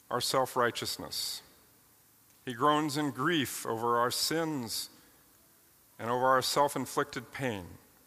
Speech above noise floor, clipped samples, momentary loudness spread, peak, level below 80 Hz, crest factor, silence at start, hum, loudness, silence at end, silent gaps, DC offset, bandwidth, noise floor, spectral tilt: 32 dB; under 0.1%; 14 LU; -12 dBFS; -72 dBFS; 20 dB; 0.1 s; none; -31 LUFS; 0.3 s; none; under 0.1%; 15.5 kHz; -63 dBFS; -3.5 dB/octave